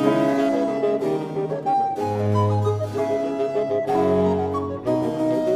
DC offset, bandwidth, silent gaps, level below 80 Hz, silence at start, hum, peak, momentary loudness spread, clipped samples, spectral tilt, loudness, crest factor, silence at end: under 0.1%; 14.5 kHz; none; -56 dBFS; 0 s; none; -6 dBFS; 5 LU; under 0.1%; -8 dB/octave; -22 LUFS; 16 dB; 0 s